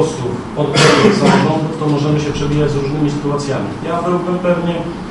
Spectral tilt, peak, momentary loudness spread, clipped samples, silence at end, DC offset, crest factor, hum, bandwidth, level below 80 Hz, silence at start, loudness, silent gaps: -5.5 dB/octave; 0 dBFS; 10 LU; under 0.1%; 0 s; under 0.1%; 14 dB; none; 11.5 kHz; -38 dBFS; 0 s; -15 LUFS; none